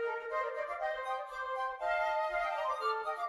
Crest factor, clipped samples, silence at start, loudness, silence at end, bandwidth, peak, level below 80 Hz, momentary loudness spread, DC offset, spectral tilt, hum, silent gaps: 14 dB; under 0.1%; 0 s; -35 LUFS; 0 s; 13.5 kHz; -22 dBFS; -68 dBFS; 5 LU; under 0.1%; -1.5 dB/octave; none; none